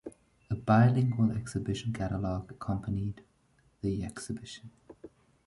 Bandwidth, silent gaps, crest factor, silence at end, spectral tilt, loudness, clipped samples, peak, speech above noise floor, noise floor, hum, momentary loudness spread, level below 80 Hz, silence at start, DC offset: 11.5 kHz; none; 20 dB; 0.4 s; -7.5 dB/octave; -31 LUFS; under 0.1%; -10 dBFS; 38 dB; -68 dBFS; none; 17 LU; -52 dBFS; 0.05 s; under 0.1%